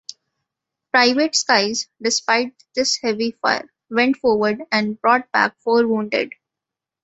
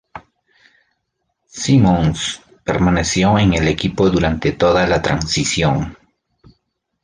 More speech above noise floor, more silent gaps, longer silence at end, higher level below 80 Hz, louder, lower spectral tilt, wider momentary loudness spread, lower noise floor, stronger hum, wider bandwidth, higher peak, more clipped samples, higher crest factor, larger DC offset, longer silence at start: first, 67 dB vs 57 dB; neither; second, 0.75 s vs 1.1 s; second, -64 dBFS vs -34 dBFS; second, -19 LUFS vs -16 LUFS; second, -2.5 dB/octave vs -5 dB/octave; second, 7 LU vs 10 LU; first, -86 dBFS vs -72 dBFS; neither; second, 8.2 kHz vs 10 kHz; about the same, 0 dBFS vs -2 dBFS; neither; about the same, 20 dB vs 16 dB; neither; first, 0.95 s vs 0.15 s